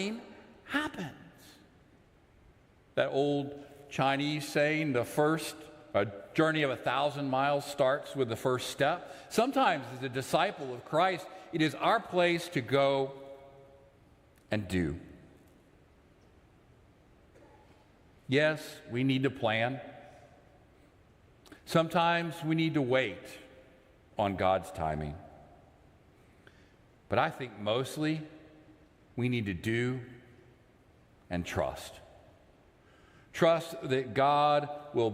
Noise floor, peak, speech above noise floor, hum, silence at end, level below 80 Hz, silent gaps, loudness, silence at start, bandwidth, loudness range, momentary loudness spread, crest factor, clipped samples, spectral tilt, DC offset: -62 dBFS; -14 dBFS; 32 dB; none; 0 s; -64 dBFS; none; -31 LUFS; 0 s; 16 kHz; 8 LU; 16 LU; 20 dB; under 0.1%; -5.5 dB/octave; under 0.1%